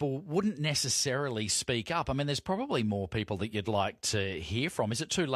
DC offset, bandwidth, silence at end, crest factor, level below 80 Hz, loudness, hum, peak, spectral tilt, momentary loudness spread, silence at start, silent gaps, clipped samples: under 0.1%; 14 kHz; 0 s; 16 dB; -54 dBFS; -31 LUFS; none; -16 dBFS; -4 dB/octave; 5 LU; 0 s; none; under 0.1%